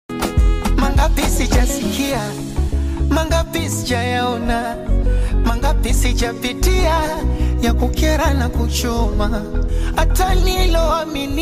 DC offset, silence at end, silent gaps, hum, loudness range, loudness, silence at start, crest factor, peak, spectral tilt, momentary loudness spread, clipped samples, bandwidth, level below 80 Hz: under 0.1%; 0 s; none; none; 1 LU; -18 LUFS; 0.1 s; 10 dB; -6 dBFS; -5 dB/octave; 4 LU; under 0.1%; 16 kHz; -18 dBFS